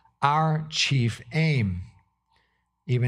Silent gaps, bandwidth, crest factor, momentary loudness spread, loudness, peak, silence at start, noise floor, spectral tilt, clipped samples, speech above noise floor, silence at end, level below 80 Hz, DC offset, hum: none; 11 kHz; 20 dB; 8 LU; -25 LUFS; -6 dBFS; 0.2 s; -71 dBFS; -5 dB/octave; under 0.1%; 47 dB; 0 s; -56 dBFS; under 0.1%; none